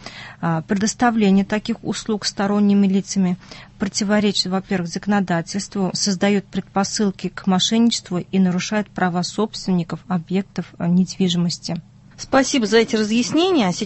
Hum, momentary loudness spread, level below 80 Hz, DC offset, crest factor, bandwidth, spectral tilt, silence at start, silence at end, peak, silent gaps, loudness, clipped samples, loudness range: none; 9 LU; -52 dBFS; under 0.1%; 16 dB; 8.6 kHz; -5 dB/octave; 0 s; 0 s; -2 dBFS; none; -20 LUFS; under 0.1%; 2 LU